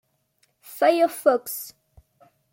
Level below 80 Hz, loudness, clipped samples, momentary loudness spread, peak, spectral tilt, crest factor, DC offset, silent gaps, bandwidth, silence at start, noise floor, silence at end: -68 dBFS; -22 LUFS; under 0.1%; 19 LU; -6 dBFS; -2.5 dB/octave; 20 dB; under 0.1%; none; 17 kHz; 0.7 s; -68 dBFS; 0.8 s